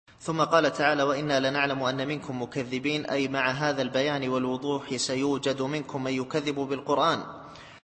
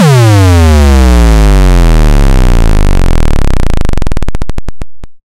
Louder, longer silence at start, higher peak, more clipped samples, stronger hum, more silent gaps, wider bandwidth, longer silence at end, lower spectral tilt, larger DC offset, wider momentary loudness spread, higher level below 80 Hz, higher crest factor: second, -27 LUFS vs -8 LUFS; first, 0.2 s vs 0 s; second, -8 dBFS vs 0 dBFS; neither; neither; neither; second, 8.8 kHz vs 15 kHz; about the same, 0.05 s vs 0.15 s; second, -4.5 dB/octave vs -6.5 dB/octave; neither; second, 8 LU vs 13 LU; second, -64 dBFS vs -6 dBFS; first, 20 dB vs 4 dB